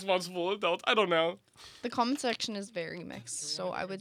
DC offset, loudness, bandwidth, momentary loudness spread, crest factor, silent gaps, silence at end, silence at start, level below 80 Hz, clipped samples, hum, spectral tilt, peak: under 0.1%; -32 LUFS; 15.5 kHz; 13 LU; 20 dB; none; 0 s; 0 s; -76 dBFS; under 0.1%; none; -3 dB/octave; -12 dBFS